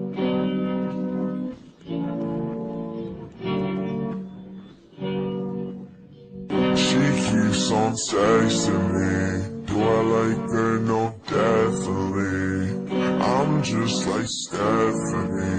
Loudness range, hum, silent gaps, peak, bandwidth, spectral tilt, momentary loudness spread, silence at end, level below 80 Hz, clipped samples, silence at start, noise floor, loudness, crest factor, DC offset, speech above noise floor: 9 LU; none; none; -10 dBFS; 9.6 kHz; -5.5 dB/octave; 13 LU; 0 s; -52 dBFS; under 0.1%; 0 s; -44 dBFS; -23 LUFS; 14 dB; under 0.1%; 23 dB